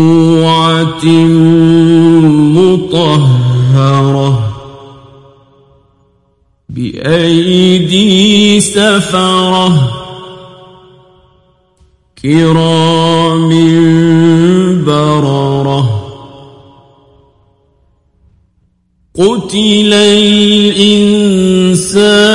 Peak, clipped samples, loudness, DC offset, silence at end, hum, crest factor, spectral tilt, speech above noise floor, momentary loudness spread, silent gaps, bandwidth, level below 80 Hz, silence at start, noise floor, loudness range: 0 dBFS; 0.2%; -8 LUFS; under 0.1%; 0 s; none; 8 dB; -5.5 dB/octave; 48 dB; 7 LU; none; 11.5 kHz; -42 dBFS; 0 s; -55 dBFS; 9 LU